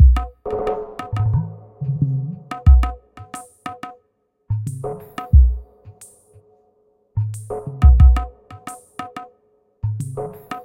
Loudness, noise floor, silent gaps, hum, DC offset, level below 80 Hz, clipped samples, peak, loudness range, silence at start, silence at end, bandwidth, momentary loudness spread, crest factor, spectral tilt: -20 LUFS; -66 dBFS; none; none; under 0.1%; -20 dBFS; under 0.1%; -2 dBFS; 3 LU; 0 s; 0.05 s; 10 kHz; 21 LU; 18 dB; -8 dB/octave